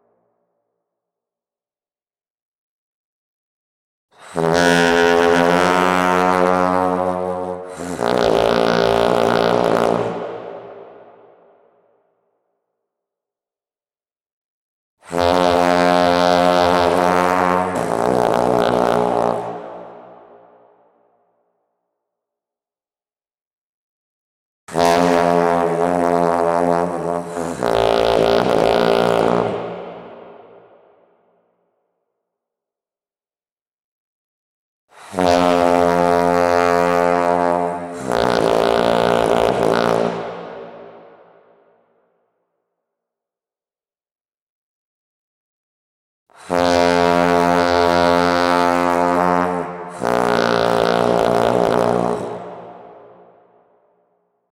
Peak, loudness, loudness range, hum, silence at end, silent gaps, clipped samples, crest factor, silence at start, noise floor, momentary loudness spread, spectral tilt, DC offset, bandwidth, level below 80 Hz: -2 dBFS; -16 LUFS; 9 LU; none; 1.6 s; 14.32-14.97 s, 23.47-24.67 s, 33.73-34.88 s, 44.21-44.25 s, 44.42-46.26 s; under 0.1%; 16 dB; 4.2 s; under -90 dBFS; 13 LU; -5 dB/octave; under 0.1%; 16.5 kHz; -48 dBFS